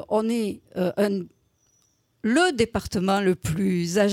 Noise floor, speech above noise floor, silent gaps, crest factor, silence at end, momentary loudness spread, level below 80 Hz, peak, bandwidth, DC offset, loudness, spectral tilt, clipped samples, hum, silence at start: -66 dBFS; 43 dB; none; 16 dB; 0 s; 9 LU; -50 dBFS; -8 dBFS; 16.5 kHz; under 0.1%; -24 LUFS; -5.5 dB/octave; under 0.1%; none; 0 s